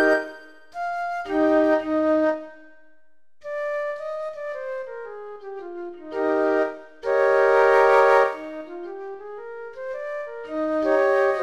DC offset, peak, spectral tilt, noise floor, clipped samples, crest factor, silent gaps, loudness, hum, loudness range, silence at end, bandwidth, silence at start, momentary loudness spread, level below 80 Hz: under 0.1%; -6 dBFS; -4.5 dB/octave; -66 dBFS; under 0.1%; 18 dB; none; -22 LUFS; none; 12 LU; 0 s; 12 kHz; 0 s; 20 LU; -60 dBFS